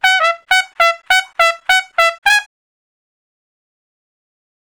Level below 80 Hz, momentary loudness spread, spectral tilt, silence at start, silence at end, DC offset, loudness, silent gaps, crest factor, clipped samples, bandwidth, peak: -56 dBFS; 3 LU; 3 dB/octave; 0.05 s; 2.35 s; 0.2%; -13 LUFS; 2.18-2.22 s; 18 dB; 0.5%; over 20 kHz; 0 dBFS